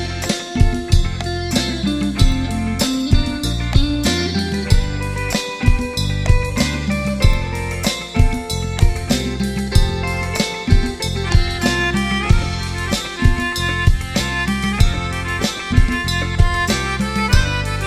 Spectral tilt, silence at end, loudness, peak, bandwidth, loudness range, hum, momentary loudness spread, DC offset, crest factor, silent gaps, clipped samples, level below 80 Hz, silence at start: -5 dB/octave; 0 s; -19 LUFS; 0 dBFS; 14.5 kHz; 1 LU; none; 5 LU; under 0.1%; 16 dB; none; under 0.1%; -20 dBFS; 0 s